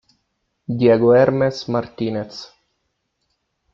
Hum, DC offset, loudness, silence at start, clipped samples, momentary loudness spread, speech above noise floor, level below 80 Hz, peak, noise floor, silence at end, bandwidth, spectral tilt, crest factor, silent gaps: none; under 0.1%; -18 LUFS; 0.7 s; under 0.1%; 20 LU; 55 dB; -56 dBFS; -2 dBFS; -72 dBFS; 1.3 s; 7.4 kHz; -7.5 dB/octave; 18 dB; none